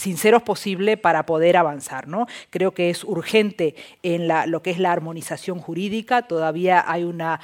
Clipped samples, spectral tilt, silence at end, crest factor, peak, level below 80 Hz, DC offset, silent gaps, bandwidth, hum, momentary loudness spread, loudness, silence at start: under 0.1%; -5 dB/octave; 0.05 s; 18 dB; -2 dBFS; -68 dBFS; under 0.1%; none; 17 kHz; none; 11 LU; -21 LUFS; 0 s